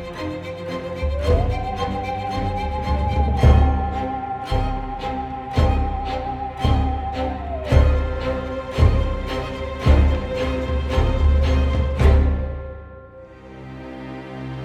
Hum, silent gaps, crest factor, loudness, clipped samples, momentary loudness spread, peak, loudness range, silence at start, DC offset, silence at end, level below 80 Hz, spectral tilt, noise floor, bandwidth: none; none; 20 dB; -22 LUFS; under 0.1%; 16 LU; 0 dBFS; 4 LU; 0 s; under 0.1%; 0 s; -22 dBFS; -7.5 dB/octave; -41 dBFS; 7.8 kHz